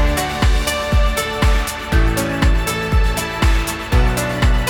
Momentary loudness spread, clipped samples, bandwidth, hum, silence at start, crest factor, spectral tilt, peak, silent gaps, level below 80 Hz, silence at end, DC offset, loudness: 2 LU; under 0.1%; 17.5 kHz; none; 0 s; 14 dB; -4.5 dB/octave; -2 dBFS; none; -18 dBFS; 0 s; under 0.1%; -18 LUFS